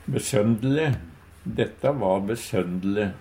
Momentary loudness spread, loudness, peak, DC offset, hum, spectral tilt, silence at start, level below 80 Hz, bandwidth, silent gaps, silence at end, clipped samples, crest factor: 7 LU; -25 LUFS; -6 dBFS; under 0.1%; none; -6 dB/octave; 0 s; -50 dBFS; 16 kHz; none; 0 s; under 0.1%; 18 dB